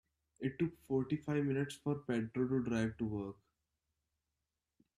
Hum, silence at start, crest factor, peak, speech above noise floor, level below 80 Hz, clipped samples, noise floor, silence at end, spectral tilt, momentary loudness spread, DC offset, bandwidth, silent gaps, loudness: none; 0.4 s; 16 dB; -22 dBFS; 52 dB; -68 dBFS; under 0.1%; -90 dBFS; 1.65 s; -7.5 dB/octave; 7 LU; under 0.1%; 14 kHz; none; -38 LUFS